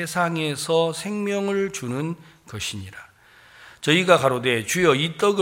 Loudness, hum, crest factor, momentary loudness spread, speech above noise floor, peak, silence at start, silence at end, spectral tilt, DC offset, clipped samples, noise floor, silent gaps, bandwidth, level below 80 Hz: -22 LUFS; none; 22 dB; 13 LU; 29 dB; -2 dBFS; 0 s; 0 s; -4 dB/octave; under 0.1%; under 0.1%; -51 dBFS; none; 16.5 kHz; -60 dBFS